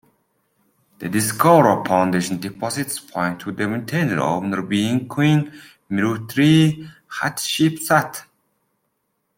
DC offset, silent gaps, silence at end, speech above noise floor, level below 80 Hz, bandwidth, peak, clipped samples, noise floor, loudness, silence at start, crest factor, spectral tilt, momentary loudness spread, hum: under 0.1%; none; 1.15 s; 53 dB; -60 dBFS; 16.5 kHz; -2 dBFS; under 0.1%; -72 dBFS; -19 LUFS; 1 s; 18 dB; -5.5 dB/octave; 12 LU; none